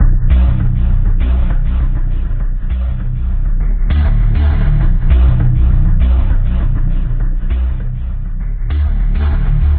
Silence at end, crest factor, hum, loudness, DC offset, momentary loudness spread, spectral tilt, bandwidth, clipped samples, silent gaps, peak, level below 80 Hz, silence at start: 0 s; 10 dB; none; -16 LUFS; under 0.1%; 8 LU; -8.5 dB/octave; 3.8 kHz; under 0.1%; none; 0 dBFS; -12 dBFS; 0 s